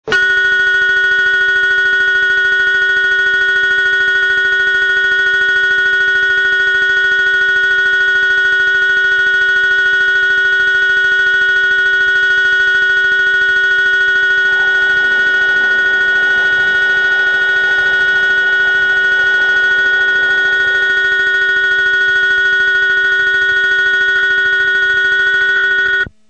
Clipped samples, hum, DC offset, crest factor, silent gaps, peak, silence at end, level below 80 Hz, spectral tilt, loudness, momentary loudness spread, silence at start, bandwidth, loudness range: under 0.1%; none; 0.4%; 8 dB; none; -2 dBFS; 0.2 s; -48 dBFS; -1 dB/octave; -10 LUFS; 1 LU; 0.05 s; 8.6 kHz; 1 LU